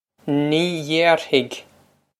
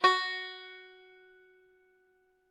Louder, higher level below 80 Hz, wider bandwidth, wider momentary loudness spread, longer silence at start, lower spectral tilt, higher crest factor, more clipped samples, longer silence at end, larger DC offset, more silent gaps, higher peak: first, -19 LUFS vs -32 LUFS; first, -68 dBFS vs -88 dBFS; first, 14.5 kHz vs 10.5 kHz; second, 11 LU vs 26 LU; first, 0.25 s vs 0 s; first, -5 dB/octave vs -1 dB/octave; about the same, 20 dB vs 24 dB; neither; second, 0.6 s vs 1.65 s; neither; neither; first, -2 dBFS vs -10 dBFS